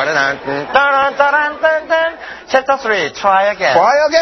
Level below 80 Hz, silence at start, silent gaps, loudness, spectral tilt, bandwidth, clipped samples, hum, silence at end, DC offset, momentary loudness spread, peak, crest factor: -52 dBFS; 0 s; none; -13 LUFS; -3 dB/octave; 6.4 kHz; under 0.1%; none; 0 s; under 0.1%; 6 LU; 0 dBFS; 14 dB